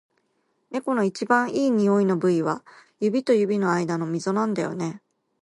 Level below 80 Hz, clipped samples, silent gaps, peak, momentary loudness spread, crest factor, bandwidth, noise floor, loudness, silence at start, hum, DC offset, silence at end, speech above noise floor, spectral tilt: -72 dBFS; under 0.1%; none; -6 dBFS; 10 LU; 18 dB; 11.5 kHz; -71 dBFS; -23 LUFS; 0.7 s; none; under 0.1%; 0.45 s; 48 dB; -6.5 dB/octave